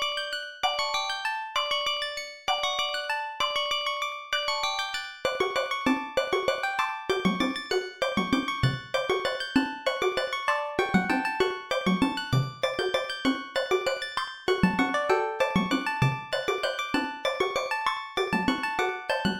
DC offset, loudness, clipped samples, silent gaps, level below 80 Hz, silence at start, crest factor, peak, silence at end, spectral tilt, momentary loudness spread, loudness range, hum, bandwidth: under 0.1%; -27 LUFS; under 0.1%; none; -54 dBFS; 0 s; 20 dB; -8 dBFS; 0 s; -4.5 dB/octave; 4 LU; 1 LU; none; 18 kHz